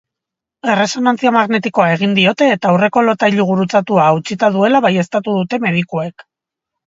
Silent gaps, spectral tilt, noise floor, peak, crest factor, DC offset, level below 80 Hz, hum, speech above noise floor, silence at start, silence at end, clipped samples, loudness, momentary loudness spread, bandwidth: none; -6 dB/octave; -83 dBFS; 0 dBFS; 14 dB; under 0.1%; -60 dBFS; none; 70 dB; 0.65 s; 0.8 s; under 0.1%; -14 LUFS; 5 LU; 7.8 kHz